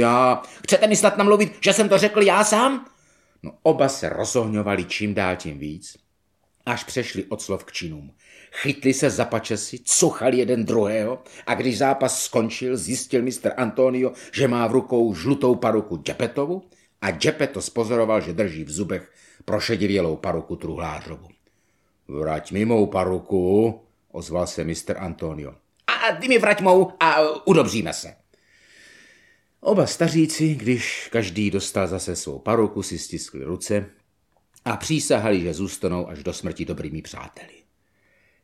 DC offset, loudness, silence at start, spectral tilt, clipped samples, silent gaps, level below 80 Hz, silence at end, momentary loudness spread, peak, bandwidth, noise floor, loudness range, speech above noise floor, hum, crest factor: under 0.1%; -22 LUFS; 0 s; -4.5 dB/octave; under 0.1%; none; -52 dBFS; 1 s; 15 LU; -2 dBFS; 15.5 kHz; -69 dBFS; 7 LU; 47 dB; none; 20 dB